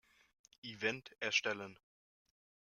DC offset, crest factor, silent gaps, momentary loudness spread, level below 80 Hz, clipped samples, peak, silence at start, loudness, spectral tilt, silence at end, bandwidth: under 0.1%; 24 dB; none; 17 LU; -84 dBFS; under 0.1%; -20 dBFS; 0.65 s; -38 LUFS; -2 dB/octave; 0.95 s; 14 kHz